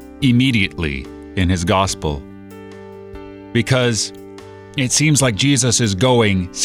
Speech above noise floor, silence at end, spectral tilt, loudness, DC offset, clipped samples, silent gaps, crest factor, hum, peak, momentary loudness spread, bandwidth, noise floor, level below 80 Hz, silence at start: 20 dB; 0 s; -4 dB/octave; -16 LUFS; under 0.1%; under 0.1%; none; 14 dB; none; -2 dBFS; 22 LU; 15.5 kHz; -36 dBFS; -38 dBFS; 0 s